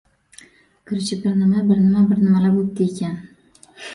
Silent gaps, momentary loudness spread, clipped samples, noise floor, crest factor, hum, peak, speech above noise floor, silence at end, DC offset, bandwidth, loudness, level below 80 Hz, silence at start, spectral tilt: none; 13 LU; under 0.1%; -49 dBFS; 12 dB; none; -6 dBFS; 32 dB; 0 s; under 0.1%; 11 kHz; -18 LUFS; -56 dBFS; 0.9 s; -7.5 dB/octave